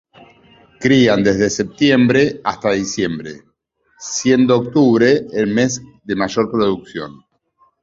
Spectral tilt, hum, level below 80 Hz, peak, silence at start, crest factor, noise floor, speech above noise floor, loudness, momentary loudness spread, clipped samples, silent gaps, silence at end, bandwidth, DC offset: -5 dB/octave; none; -50 dBFS; -2 dBFS; 0.8 s; 16 dB; -62 dBFS; 47 dB; -16 LUFS; 14 LU; under 0.1%; none; 0.7 s; 7.8 kHz; under 0.1%